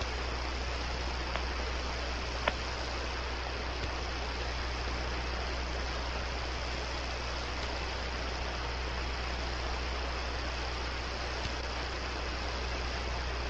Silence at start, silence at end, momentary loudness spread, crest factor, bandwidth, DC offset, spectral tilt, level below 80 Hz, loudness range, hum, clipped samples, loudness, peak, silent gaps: 0 s; 0 s; 1 LU; 26 dB; 8.2 kHz; under 0.1%; -4 dB/octave; -38 dBFS; 1 LU; none; under 0.1%; -36 LUFS; -10 dBFS; none